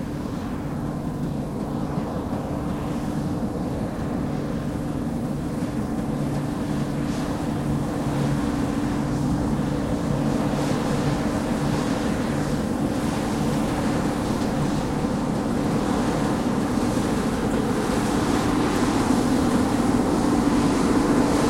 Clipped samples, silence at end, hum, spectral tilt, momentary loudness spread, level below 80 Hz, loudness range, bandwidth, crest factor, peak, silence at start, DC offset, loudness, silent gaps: under 0.1%; 0 s; none; -6.5 dB/octave; 7 LU; -38 dBFS; 6 LU; 16.5 kHz; 16 dB; -8 dBFS; 0 s; under 0.1%; -24 LUFS; none